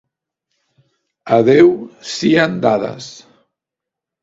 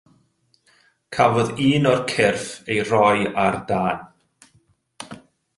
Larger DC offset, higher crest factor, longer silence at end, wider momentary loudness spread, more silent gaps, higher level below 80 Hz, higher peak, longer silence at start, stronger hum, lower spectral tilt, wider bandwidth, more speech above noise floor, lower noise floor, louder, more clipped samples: neither; about the same, 16 dB vs 20 dB; first, 1.1 s vs 0.4 s; about the same, 16 LU vs 18 LU; neither; about the same, -56 dBFS vs -54 dBFS; about the same, 0 dBFS vs -2 dBFS; first, 1.25 s vs 1.1 s; neither; about the same, -5.5 dB/octave vs -5.5 dB/octave; second, 7.8 kHz vs 11.5 kHz; first, 70 dB vs 44 dB; first, -84 dBFS vs -63 dBFS; first, -14 LUFS vs -20 LUFS; neither